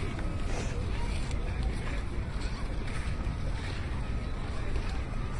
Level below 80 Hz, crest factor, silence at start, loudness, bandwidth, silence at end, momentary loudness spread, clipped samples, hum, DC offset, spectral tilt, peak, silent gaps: -34 dBFS; 12 dB; 0 s; -36 LUFS; 11.5 kHz; 0 s; 2 LU; under 0.1%; none; under 0.1%; -6 dB/octave; -20 dBFS; none